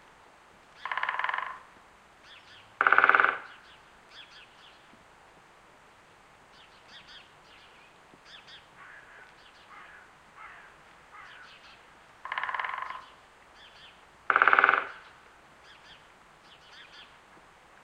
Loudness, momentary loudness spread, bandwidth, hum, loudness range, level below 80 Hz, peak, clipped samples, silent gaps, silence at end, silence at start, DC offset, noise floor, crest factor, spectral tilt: -26 LUFS; 30 LU; 10.5 kHz; none; 23 LU; -72 dBFS; -2 dBFS; under 0.1%; none; 0.8 s; 0.8 s; under 0.1%; -57 dBFS; 32 dB; -2.5 dB/octave